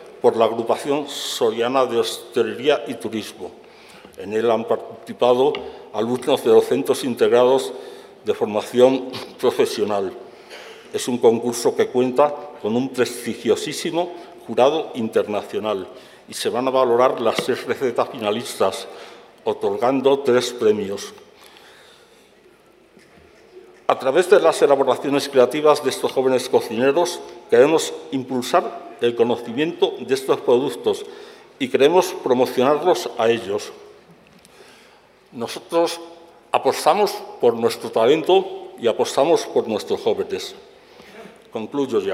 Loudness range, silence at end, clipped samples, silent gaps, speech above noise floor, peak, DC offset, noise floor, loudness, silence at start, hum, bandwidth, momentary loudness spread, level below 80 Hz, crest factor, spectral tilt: 5 LU; 0 s; under 0.1%; none; 33 dB; 0 dBFS; under 0.1%; -52 dBFS; -20 LUFS; 0 s; none; 16 kHz; 15 LU; -70 dBFS; 20 dB; -4 dB/octave